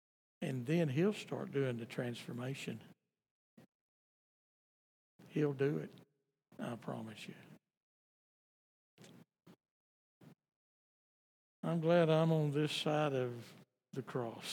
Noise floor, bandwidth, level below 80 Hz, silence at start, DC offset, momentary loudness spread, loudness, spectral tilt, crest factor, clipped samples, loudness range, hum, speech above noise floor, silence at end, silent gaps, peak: -75 dBFS; 15 kHz; under -90 dBFS; 0.4 s; under 0.1%; 17 LU; -37 LUFS; -6.5 dB/octave; 20 dB; under 0.1%; 16 LU; none; 38 dB; 0 s; 3.31-3.57 s, 3.68-5.19 s, 7.77-8.98 s, 9.71-10.21 s, 10.56-11.63 s; -20 dBFS